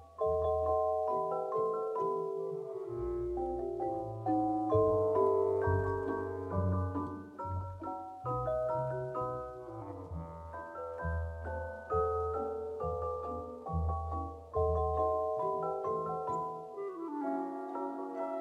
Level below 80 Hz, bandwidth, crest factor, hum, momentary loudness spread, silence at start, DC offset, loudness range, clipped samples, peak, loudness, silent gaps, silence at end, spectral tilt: -50 dBFS; 9 kHz; 18 dB; none; 11 LU; 0 s; under 0.1%; 6 LU; under 0.1%; -16 dBFS; -35 LUFS; none; 0 s; -10 dB/octave